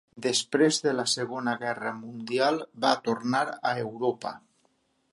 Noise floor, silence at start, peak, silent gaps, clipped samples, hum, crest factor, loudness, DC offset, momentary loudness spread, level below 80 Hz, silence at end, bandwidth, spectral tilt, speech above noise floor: -70 dBFS; 0.15 s; -8 dBFS; none; under 0.1%; none; 20 dB; -27 LUFS; under 0.1%; 11 LU; -78 dBFS; 0.75 s; 11.5 kHz; -3.5 dB/octave; 43 dB